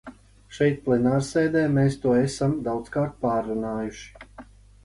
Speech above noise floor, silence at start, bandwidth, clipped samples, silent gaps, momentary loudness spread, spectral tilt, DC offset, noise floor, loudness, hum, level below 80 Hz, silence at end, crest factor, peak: 24 dB; 0.05 s; 11.5 kHz; under 0.1%; none; 11 LU; -7 dB/octave; under 0.1%; -47 dBFS; -24 LUFS; none; -50 dBFS; 0.4 s; 16 dB; -10 dBFS